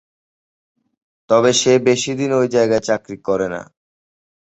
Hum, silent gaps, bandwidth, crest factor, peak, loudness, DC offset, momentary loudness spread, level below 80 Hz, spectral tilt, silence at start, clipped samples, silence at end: none; none; 8.2 kHz; 16 dB; -2 dBFS; -16 LUFS; under 0.1%; 9 LU; -56 dBFS; -4 dB/octave; 1.3 s; under 0.1%; 0.95 s